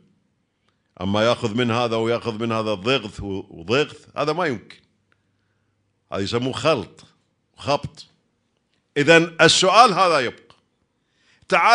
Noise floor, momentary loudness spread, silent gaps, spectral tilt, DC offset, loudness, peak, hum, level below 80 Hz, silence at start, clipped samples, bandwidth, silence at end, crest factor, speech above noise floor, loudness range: -69 dBFS; 18 LU; none; -4 dB/octave; under 0.1%; -19 LUFS; 0 dBFS; none; -56 dBFS; 1 s; under 0.1%; 10.5 kHz; 0 s; 20 dB; 50 dB; 9 LU